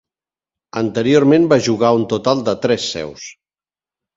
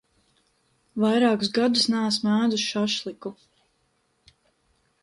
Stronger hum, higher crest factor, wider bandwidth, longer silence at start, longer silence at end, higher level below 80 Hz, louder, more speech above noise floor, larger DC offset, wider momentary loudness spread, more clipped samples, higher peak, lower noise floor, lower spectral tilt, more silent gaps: neither; about the same, 18 dB vs 18 dB; second, 7.8 kHz vs 11.5 kHz; second, 0.75 s vs 0.95 s; second, 0.85 s vs 1.7 s; first, -54 dBFS vs -68 dBFS; first, -15 LUFS vs -23 LUFS; first, over 75 dB vs 47 dB; neither; about the same, 17 LU vs 15 LU; neither; first, 0 dBFS vs -8 dBFS; first, under -90 dBFS vs -70 dBFS; first, -5.5 dB/octave vs -4 dB/octave; neither